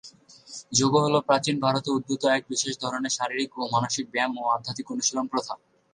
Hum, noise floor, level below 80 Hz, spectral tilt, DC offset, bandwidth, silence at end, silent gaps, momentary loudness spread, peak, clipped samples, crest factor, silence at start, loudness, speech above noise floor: none; -49 dBFS; -66 dBFS; -3.5 dB/octave; under 0.1%; 11 kHz; 0.35 s; none; 9 LU; -6 dBFS; under 0.1%; 20 dB; 0.05 s; -25 LUFS; 24 dB